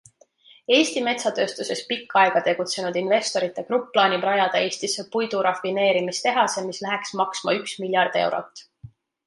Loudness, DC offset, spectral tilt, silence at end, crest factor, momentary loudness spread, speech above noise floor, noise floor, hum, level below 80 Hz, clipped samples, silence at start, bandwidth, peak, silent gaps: -22 LUFS; under 0.1%; -3 dB/octave; 0.4 s; 20 dB; 8 LU; 32 dB; -54 dBFS; none; -70 dBFS; under 0.1%; 0.7 s; 11.5 kHz; -4 dBFS; none